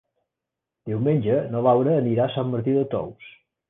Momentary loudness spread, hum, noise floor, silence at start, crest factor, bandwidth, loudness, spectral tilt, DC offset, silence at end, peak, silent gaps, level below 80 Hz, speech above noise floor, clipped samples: 11 LU; none; -85 dBFS; 0.85 s; 16 dB; 3.9 kHz; -22 LUFS; -11.5 dB/octave; under 0.1%; 0.4 s; -8 dBFS; none; -60 dBFS; 64 dB; under 0.1%